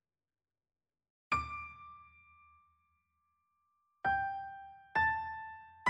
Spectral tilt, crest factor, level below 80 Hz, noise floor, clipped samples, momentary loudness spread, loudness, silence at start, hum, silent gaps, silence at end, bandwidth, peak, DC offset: -1.5 dB/octave; 22 dB; -62 dBFS; under -90 dBFS; under 0.1%; 20 LU; -36 LUFS; 1.3 s; none; none; 0 s; 7.4 kHz; -18 dBFS; under 0.1%